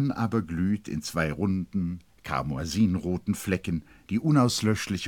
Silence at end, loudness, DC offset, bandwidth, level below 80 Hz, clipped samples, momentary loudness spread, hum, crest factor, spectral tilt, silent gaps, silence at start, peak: 0 s; -28 LUFS; under 0.1%; 17.5 kHz; -50 dBFS; under 0.1%; 9 LU; none; 18 dB; -6 dB/octave; none; 0 s; -10 dBFS